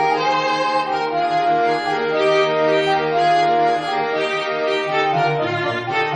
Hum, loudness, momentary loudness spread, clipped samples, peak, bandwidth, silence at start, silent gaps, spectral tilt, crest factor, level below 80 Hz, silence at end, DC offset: none; -18 LUFS; 4 LU; under 0.1%; -6 dBFS; 10.5 kHz; 0 s; none; -5 dB/octave; 12 dB; -62 dBFS; 0 s; under 0.1%